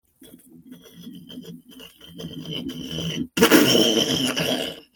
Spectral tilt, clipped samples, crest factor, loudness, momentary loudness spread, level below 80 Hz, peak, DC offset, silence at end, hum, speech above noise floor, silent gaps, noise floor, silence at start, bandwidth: -3.5 dB/octave; under 0.1%; 24 dB; -20 LUFS; 27 LU; -58 dBFS; 0 dBFS; under 0.1%; 0.15 s; none; 27 dB; none; -50 dBFS; 0.2 s; 19 kHz